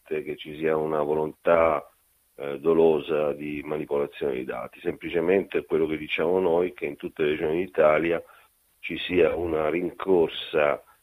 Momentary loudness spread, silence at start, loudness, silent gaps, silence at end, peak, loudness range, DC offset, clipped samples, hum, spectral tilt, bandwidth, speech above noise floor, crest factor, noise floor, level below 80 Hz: 12 LU; 0.1 s; -25 LUFS; none; 0.2 s; -6 dBFS; 2 LU; under 0.1%; under 0.1%; none; -7 dB/octave; 15 kHz; 22 dB; 20 dB; -47 dBFS; -56 dBFS